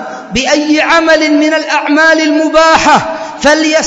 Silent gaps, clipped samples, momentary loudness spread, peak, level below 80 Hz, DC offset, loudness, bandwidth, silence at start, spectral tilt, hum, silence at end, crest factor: none; 0.6%; 5 LU; 0 dBFS; -40 dBFS; under 0.1%; -8 LUFS; 9.4 kHz; 0 s; -3 dB/octave; none; 0 s; 8 dB